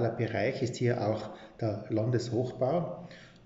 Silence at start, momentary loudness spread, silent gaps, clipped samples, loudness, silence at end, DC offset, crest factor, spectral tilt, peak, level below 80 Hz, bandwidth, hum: 0 s; 10 LU; none; under 0.1%; -32 LUFS; 0.15 s; under 0.1%; 16 dB; -6.5 dB/octave; -14 dBFS; -64 dBFS; 8 kHz; none